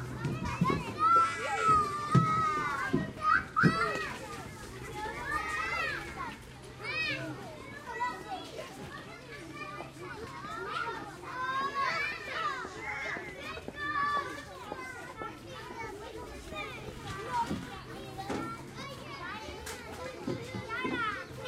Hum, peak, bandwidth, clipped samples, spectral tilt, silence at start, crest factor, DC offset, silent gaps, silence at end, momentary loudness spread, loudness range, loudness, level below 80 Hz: none; -12 dBFS; 16 kHz; under 0.1%; -5 dB/octave; 0 s; 22 dB; under 0.1%; none; 0 s; 16 LU; 11 LU; -34 LUFS; -56 dBFS